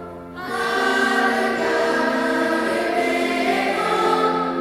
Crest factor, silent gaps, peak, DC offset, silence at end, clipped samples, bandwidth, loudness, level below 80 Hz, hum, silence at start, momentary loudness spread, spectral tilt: 14 dB; none; -6 dBFS; under 0.1%; 0 s; under 0.1%; 16.5 kHz; -20 LUFS; -56 dBFS; none; 0 s; 4 LU; -3.5 dB/octave